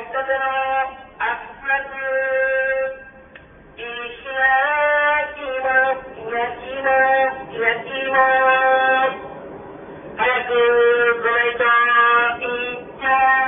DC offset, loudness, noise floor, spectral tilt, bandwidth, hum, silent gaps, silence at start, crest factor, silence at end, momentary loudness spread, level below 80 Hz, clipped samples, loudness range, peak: under 0.1%; -18 LUFS; -44 dBFS; -7.5 dB/octave; 3.7 kHz; none; none; 0 s; 16 dB; 0 s; 14 LU; -54 dBFS; under 0.1%; 5 LU; -4 dBFS